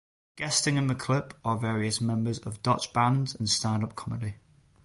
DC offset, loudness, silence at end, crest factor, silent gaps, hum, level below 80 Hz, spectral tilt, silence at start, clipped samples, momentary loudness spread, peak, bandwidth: under 0.1%; -28 LUFS; 0.5 s; 18 dB; none; none; -56 dBFS; -4.5 dB/octave; 0.35 s; under 0.1%; 9 LU; -10 dBFS; 11.5 kHz